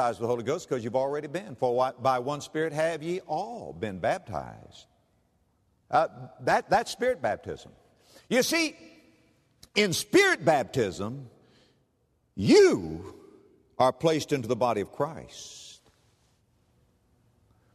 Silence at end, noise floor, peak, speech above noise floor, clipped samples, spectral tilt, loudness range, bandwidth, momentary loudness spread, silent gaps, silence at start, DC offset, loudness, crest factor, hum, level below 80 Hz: 2 s; -71 dBFS; -8 dBFS; 44 dB; under 0.1%; -4.5 dB/octave; 7 LU; 13.5 kHz; 19 LU; none; 0 s; under 0.1%; -27 LUFS; 20 dB; none; -62 dBFS